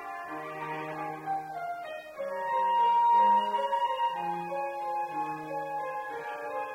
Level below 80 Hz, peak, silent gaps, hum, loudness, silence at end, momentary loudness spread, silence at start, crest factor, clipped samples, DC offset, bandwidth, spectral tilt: -76 dBFS; -16 dBFS; none; none; -30 LUFS; 0 s; 14 LU; 0 s; 14 dB; under 0.1%; under 0.1%; 15.5 kHz; -4.5 dB/octave